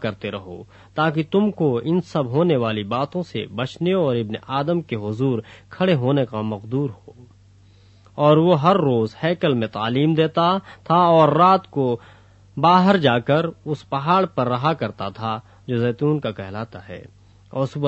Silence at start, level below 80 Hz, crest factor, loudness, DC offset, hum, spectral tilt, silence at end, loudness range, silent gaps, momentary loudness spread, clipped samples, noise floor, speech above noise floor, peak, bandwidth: 0 s; -58 dBFS; 18 dB; -20 LUFS; under 0.1%; none; -8 dB/octave; 0 s; 6 LU; none; 15 LU; under 0.1%; -51 dBFS; 31 dB; -2 dBFS; 8.2 kHz